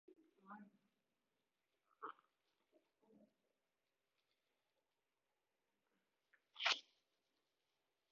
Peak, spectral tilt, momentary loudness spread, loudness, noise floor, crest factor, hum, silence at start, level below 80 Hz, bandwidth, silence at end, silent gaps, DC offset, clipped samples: -22 dBFS; 2.5 dB/octave; 21 LU; -41 LUFS; under -90 dBFS; 34 dB; none; 0.1 s; under -90 dBFS; 6 kHz; 1.3 s; none; under 0.1%; under 0.1%